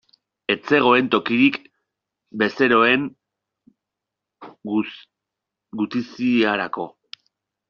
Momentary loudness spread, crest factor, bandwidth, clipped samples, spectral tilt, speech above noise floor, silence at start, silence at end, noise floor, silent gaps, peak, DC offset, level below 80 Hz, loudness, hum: 17 LU; 20 dB; 6.8 kHz; under 0.1%; -2.5 dB/octave; 65 dB; 0.5 s; 0.8 s; -84 dBFS; none; -2 dBFS; under 0.1%; -64 dBFS; -19 LUFS; none